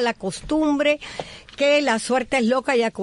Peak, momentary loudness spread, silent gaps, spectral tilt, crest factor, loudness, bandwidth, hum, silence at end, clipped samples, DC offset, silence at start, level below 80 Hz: -8 dBFS; 12 LU; none; -4 dB/octave; 14 dB; -21 LUFS; 11 kHz; none; 0 s; under 0.1%; under 0.1%; 0 s; -50 dBFS